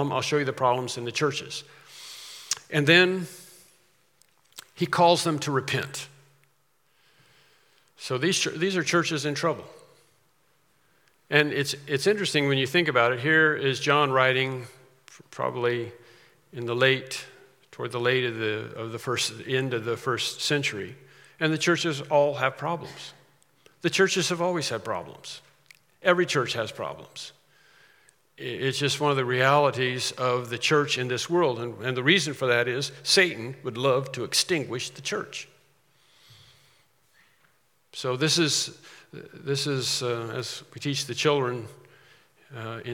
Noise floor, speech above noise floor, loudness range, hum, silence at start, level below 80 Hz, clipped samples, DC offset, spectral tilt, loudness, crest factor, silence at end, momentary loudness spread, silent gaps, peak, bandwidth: -69 dBFS; 43 dB; 6 LU; none; 0 s; -76 dBFS; under 0.1%; under 0.1%; -3.5 dB/octave; -25 LUFS; 24 dB; 0 s; 18 LU; none; -2 dBFS; 17.5 kHz